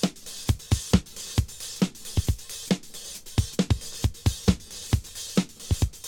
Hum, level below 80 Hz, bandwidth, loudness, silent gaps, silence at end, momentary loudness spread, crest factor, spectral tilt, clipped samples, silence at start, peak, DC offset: none; -34 dBFS; 18.5 kHz; -28 LUFS; none; 0 s; 6 LU; 22 dB; -5 dB/octave; under 0.1%; 0 s; -4 dBFS; under 0.1%